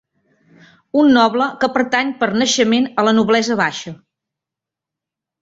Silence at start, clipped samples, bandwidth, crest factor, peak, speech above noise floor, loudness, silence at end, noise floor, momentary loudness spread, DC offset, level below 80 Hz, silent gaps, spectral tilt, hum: 0.95 s; under 0.1%; 7.8 kHz; 16 dB; -2 dBFS; 70 dB; -15 LUFS; 1.45 s; -85 dBFS; 7 LU; under 0.1%; -60 dBFS; none; -3.5 dB/octave; none